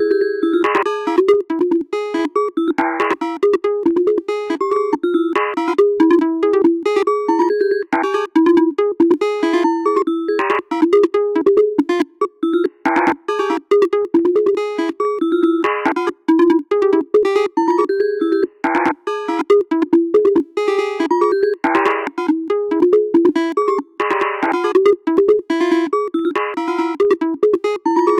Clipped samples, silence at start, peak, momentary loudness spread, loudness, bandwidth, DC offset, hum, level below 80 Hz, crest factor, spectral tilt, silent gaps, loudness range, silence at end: under 0.1%; 0 s; -2 dBFS; 5 LU; -16 LUFS; 9.2 kHz; under 0.1%; none; -62 dBFS; 14 dB; -5 dB/octave; none; 2 LU; 0 s